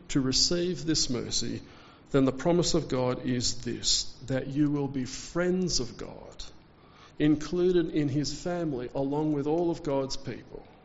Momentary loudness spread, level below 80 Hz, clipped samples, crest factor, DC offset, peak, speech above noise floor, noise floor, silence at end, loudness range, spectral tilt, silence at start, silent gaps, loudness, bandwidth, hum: 13 LU; -48 dBFS; under 0.1%; 18 dB; under 0.1%; -12 dBFS; 26 dB; -54 dBFS; 0.15 s; 3 LU; -5 dB/octave; 0 s; none; -28 LUFS; 8 kHz; none